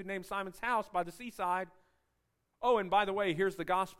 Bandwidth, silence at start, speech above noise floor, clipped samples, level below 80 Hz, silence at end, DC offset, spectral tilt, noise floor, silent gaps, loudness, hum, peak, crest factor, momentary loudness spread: 16 kHz; 0 s; 47 dB; under 0.1%; -64 dBFS; 0.05 s; under 0.1%; -5 dB/octave; -80 dBFS; none; -34 LUFS; none; -16 dBFS; 18 dB; 9 LU